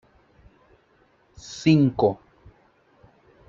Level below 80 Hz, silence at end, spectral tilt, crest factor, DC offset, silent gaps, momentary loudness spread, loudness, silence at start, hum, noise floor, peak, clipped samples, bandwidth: -58 dBFS; 1.35 s; -7 dB/octave; 20 dB; under 0.1%; none; 21 LU; -21 LUFS; 1.45 s; none; -61 dBFS; -6 dBFS; under 0.1%; 7.6 kHz